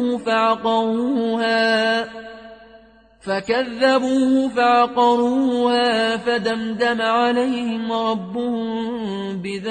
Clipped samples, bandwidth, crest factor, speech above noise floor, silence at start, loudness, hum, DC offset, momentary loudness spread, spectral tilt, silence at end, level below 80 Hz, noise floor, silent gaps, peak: under 0.1%; 9.4 kHz; 16 dB; 30 dB; 0 s; -19 LUFS; none; under 0.1%; 9 LU; -5 dB/octave; 0 s; -58 dBFS; -49 dBFS; none; -4 dBFS